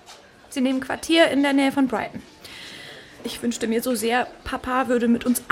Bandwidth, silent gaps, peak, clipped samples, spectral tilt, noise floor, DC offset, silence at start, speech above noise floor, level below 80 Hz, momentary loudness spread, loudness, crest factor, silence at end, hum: 16.5 kHz; none; -4 dBFS; under 0.1%; -3.5 dB/octave; -47 dBFS; under 0.1%; 0.1 s; 25 dB; -52 dBFS; 19 LU; -22 LUFS; 18 dB; 0.1 s; none